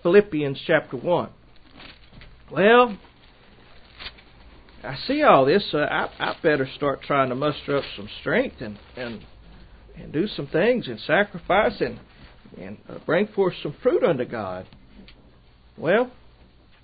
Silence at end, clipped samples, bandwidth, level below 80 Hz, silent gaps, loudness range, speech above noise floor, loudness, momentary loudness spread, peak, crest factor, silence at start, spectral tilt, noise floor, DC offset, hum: 0.75 s; under 0.1%; 5 kHz; -52 dBFS; none; 5 LU; 30 dB; -22 LUFS; 21 LU; -2 dBFS; 22 dB; 0.05 s; -10.5 dB/octave; -52 dBFS; under 0.1%; none